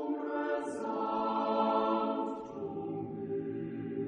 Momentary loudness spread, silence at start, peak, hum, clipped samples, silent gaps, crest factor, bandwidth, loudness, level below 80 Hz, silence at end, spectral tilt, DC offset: 9 LU; 0 s; -18 dBFS; none; under 0.1%; none; 16 dB; 10 kHz; -34 LUFS; -74 dBFS; 0 s; -7 dB/octave; under 0.1%